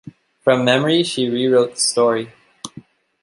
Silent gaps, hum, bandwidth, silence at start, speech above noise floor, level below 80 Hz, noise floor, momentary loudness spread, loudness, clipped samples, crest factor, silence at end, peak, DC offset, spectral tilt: none; none; 11.5 kHz; 0.05 s; 27 dB; -64 dBFS; -43 dBFS; 20 LU; -17 LUFS; under 0.1%; 16 dB; 0.4 s; -2 dBFS; under 0.1%; -4 dB/octave